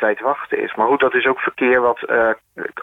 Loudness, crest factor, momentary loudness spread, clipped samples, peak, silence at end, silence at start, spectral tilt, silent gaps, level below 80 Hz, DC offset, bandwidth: -17 LUFS; 14 dB; 7 LU; under 0.1%; -4 dBFS; 0 s; 0 s; -6.5 dB/octave; none; -56 dBFS; under 0.1%; 3.9 kHz